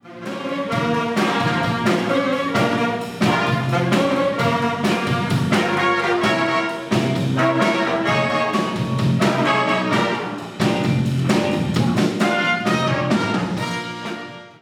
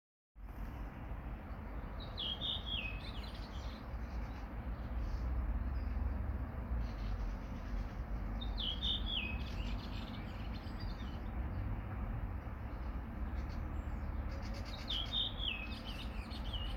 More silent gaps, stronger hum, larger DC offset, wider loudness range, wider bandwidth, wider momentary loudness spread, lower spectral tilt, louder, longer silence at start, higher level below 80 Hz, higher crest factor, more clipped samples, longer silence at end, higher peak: neither; neither; neither; about the same, 1 LU vs 3 LU; first, 17 kHz vs 14 kHz; second, 6 LU vs 9 LU; about the same, -6 dB/octave vs -6 dB/octave; first, -19 LUFS vs -42 LUFS; second, 0.05 s vs 0.35 s; second, -56 dBFS vs -42 dBFS; about the same, 16 dB vs 16 dB; neither; about the same, 0.1 s vs 0 s; first, -4 dBFS vs -26 dBFS